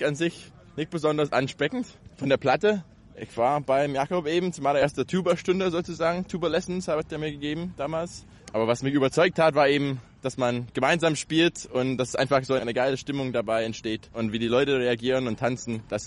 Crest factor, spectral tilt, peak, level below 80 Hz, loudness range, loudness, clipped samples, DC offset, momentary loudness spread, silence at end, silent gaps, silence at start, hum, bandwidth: 16 dB; -5 dB/octave; -10 dBFS; -56 dBFS; 3 LU; -26 LUFS; under 0.1%; under 0.1%; 10 LU; 0 s; none; 0 s; none; 11.5 kHz